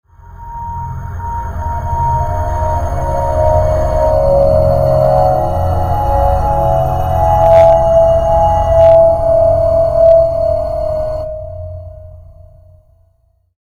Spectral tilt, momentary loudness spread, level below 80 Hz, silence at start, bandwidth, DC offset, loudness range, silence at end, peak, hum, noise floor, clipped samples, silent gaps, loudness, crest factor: -8 dB/octave; 15 LU; -22 dBFS; 0.3 s; 15.5 kHz; under 0.1%; 8 LU; 1.4 s; 0 dBFS; none; -55 dBFS; under 0.1%; none; -12 LUFS; 12 dB